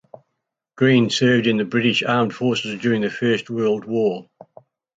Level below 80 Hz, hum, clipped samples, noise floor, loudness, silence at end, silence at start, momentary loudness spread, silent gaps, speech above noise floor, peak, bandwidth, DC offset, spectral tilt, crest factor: -64 dBFS; none; under 0.1%; -78 dBFS; -19 LUFS; 0.75 s; 0.75 s; 6 LU; none; 59 dB; -4 dBFS; 7.8 kHz; under 0.1%; -5.5 dB/octave; 16 dB